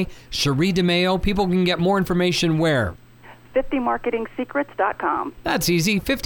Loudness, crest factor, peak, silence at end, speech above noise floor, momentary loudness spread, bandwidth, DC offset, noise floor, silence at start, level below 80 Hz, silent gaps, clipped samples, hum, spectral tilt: -21 LUFS; 14 dB; -8 dBFS; 0.05 s; 25 dB; 7 LU; 19.5 kHz; under 0.1%; -46 dBFS; 0 s; -38 dBFS; none; under 0.1%; none; -5 dB/octave